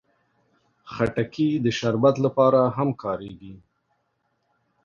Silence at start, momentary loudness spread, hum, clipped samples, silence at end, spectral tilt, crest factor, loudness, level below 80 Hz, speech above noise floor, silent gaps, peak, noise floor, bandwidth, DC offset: 0.85 s; 16 LU; none; under 0.1%; 1.25 s; -7 dB/octave; 18 dB; -22 LUFS; -58 dBFS; 50 dB; none; -6 dBFS; -72 dBFS; 7.4 kHz; under 0.1%